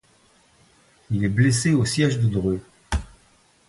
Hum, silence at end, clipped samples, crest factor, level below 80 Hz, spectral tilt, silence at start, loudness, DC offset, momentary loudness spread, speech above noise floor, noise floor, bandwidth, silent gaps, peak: none; 0.65 s; under 0.1%; 18 dB; -38 dBFS; -5.5 dB/octave; 1.1 s; -22 LUFS; under 0.1%; 11 LU; 38 dB; -58 dBFS; 11.5 kHz; none; -6 dBFS